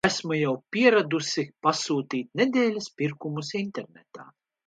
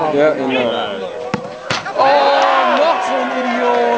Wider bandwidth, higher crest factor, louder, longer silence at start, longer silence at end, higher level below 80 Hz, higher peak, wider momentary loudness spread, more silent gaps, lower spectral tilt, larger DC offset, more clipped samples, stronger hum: first, 10 kHz vs 8 kHz; first, 20 dB vs 14 dB; second, -26 LUFS vs -15 LUFS; about the same, 0.05 s vs 0 s; first, 0.4 s vs 0 s; second, -68 dBFS vs -58 dBFS; second, -6 dBFS vs 0 dBFS; about the same, 11 LU vs 11 LU; neither; about the same, -4.5 dB/octave vs -4 dB/octave; second, under 0.1% vs 0.1%; neither; neither